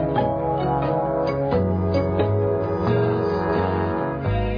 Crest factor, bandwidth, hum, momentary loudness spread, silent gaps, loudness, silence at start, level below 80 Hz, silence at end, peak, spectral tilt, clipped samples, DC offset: 12 dB; 5.2 kHz; none; 2 LU; none; -22 LUFS; 0 s; -38 dBFS; 0 s; -8 dBFS; -10 dB/octave; under 0.1%; under 0.1%